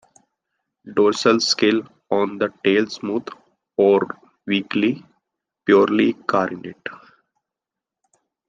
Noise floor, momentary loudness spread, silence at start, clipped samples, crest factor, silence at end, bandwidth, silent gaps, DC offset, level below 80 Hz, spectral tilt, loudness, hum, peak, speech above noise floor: -87 dBFS; 16 LU; 0.85 s; under 0.1%; 18 dB; 1.5 s; 9.4 kHz; none; under 0.1%; -68 dBFS; -4.5 dB/octave; -20 LUFS; none; -2 dBFS; 68 dB